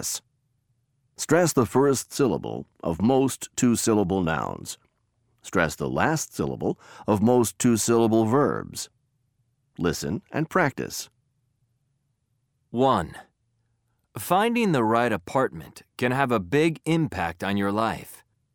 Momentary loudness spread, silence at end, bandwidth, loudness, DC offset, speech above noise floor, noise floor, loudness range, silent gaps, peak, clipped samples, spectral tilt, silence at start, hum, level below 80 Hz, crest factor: 14 LU; 0.4 s; 20 kHz; -24 LUFS; under 0.1%; 49 dB; -73 dBFS; 7 LU; none; -6 dBFS; under 0.1%; -5 dB/octave; 0 s; none; -54 dBFS; 20 dB